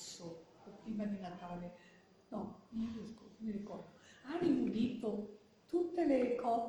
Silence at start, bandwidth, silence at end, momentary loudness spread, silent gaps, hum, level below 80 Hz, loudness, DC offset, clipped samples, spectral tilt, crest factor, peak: 0 s; 12 kHz; 0 s; 18 LU; none; none; -70 dBFS; -40 LUFS; under 0.1%; under 0.1%; -6.5 dB/octave; 18 dB; -22 dBFS